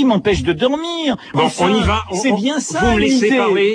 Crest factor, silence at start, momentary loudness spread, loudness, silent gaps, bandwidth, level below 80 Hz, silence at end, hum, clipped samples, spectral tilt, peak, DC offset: 12 dB; 0 s; 5 LU; -16 LUFS; none; 10.5 kHz; -32 dBFS; 0 s; none; under 0.1%; -4.5 dB/octave; -2 dBFS; under 0.1%